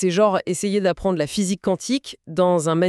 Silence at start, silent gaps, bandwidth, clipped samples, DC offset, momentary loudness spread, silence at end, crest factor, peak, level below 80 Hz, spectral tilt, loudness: 0 s; none; 13 kHz; under 0.1%; under 0.1%; 6 LU; 0 s; 14 dB; -6 dBFS; -50 dBFS; -5 dB/octave; -21 LUFS